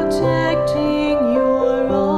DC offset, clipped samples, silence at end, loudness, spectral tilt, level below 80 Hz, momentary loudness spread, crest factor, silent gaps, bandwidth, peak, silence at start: under 0.1%; under 0.1%; 0 s; -17 LUFS; -7 dB/octave; -38 dBFS; 2 LU; 10 dB; none; 13 kHz; -6 dBFS; 0 s